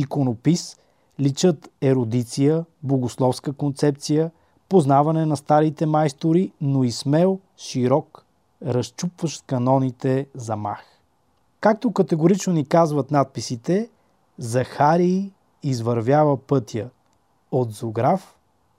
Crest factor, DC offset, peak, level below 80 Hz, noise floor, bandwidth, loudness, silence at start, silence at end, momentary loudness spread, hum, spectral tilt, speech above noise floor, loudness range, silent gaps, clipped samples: 18 dB; under 0.1%; -4 dBFS; -66 dBFS; -65 dBFS; 13.5 kHz; -21 LUFS; 0 s; 0.55 s; 10 LU; none; -7 dB/octave; 45 dB; 4 LU; none; under 0.1%